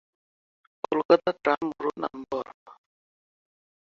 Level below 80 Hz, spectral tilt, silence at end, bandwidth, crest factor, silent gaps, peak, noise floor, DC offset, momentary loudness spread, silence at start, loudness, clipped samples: -68 dBFS; -6.5 dB/octave; 1.25 s; 7 kHz; 24 dB; 1.05-1.09 s, 2.54-2.66 s; -6 dBFS; under -90 dBFS; under 0.1%; 13 LU; 0.9 s; -27 LUFS; under 0.1%